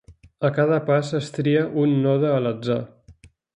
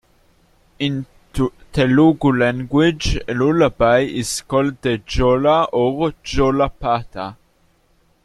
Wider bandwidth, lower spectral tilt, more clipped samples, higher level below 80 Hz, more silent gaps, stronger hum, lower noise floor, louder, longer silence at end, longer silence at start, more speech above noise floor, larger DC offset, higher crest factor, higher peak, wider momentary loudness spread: second, 10 kHz vs 13 kHz; first, -7.5 dB/octave vs -6 dB/octave; neither; second, -58 dBFS vs -34 dBFS; neither; neither; second, -51 dBFS vs -58 dBFS; second, -22 LUFS vs -18 LUFS; second, 0.45 s vs 0.9 s; second, 0.1 s vs 0.8 s; second, 30 dB vs 41 dB; neither; about the same, 16 dB vs 16 dB; second, -6 dBFS vs -2 dBFS; about the same, 7 LU vs 9 LU